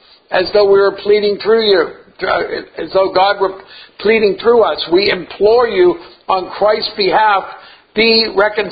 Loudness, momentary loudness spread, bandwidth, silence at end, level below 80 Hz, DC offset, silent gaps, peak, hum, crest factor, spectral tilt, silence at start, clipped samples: -13 LUFS; 9 LU; 5 kHz; 0 s; -48 dBFS; under 0.1%; none; 0 dBFS; none; 14 dB; -7.5 dB/octave; 0.3 s; under 0.1%